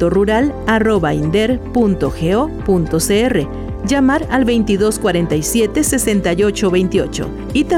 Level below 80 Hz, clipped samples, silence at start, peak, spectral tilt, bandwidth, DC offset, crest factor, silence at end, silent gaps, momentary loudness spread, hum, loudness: -30 dBFS; under 0.1%; 0 s; -4 dBFS; -5 dB/octave; 17 kHz; under 0.1%; 10 dB; 0 s; none; 4 LU; none; -15 LUFS